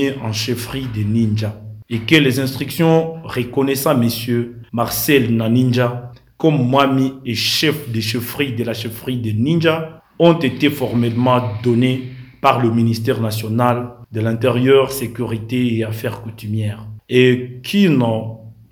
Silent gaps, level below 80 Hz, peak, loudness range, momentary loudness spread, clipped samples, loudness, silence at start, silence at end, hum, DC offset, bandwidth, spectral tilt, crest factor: none; -50 dBFS; 0 dBFS; 2 LU; 11 LU; under 0.1%; -17 LUFS; 0 s; 0.2 s; none; under 0.1%; over 20 kHz; -6 dB/octave; 16 dB